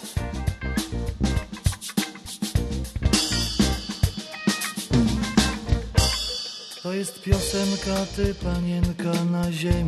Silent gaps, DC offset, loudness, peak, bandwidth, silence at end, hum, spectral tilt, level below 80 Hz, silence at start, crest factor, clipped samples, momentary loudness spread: none; under 0.1%; -25 LUFS; -6 dBFS; 13 kHz; 0 s; none; -4.5 dB/octave; -32 dBFS; 0 s; 20 dB; under 0.1%; 8 LU